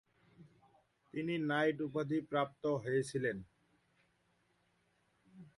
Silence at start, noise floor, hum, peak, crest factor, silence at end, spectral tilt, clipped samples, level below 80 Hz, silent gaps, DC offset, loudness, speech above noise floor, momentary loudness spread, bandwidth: 0.4 s; -77 dBFS; none; -22 dBFS; 18 dB; 0.1 s; -6 dB/octave; under 0.1%; -76 dBFS; none; under 0.1%; -37 LUFS; 40 dB; 7 LU; 11.5 kHz